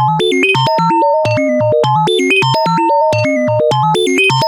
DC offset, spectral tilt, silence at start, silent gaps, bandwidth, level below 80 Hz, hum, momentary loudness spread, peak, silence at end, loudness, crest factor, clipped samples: under 0.1%; -5 dB/octave; 0 s; none; 18.5 kHz; -52 dBFS; none; 2 LU; -2 dBFS; 0 s; -12 LUFS; 10 dB; under 0.1%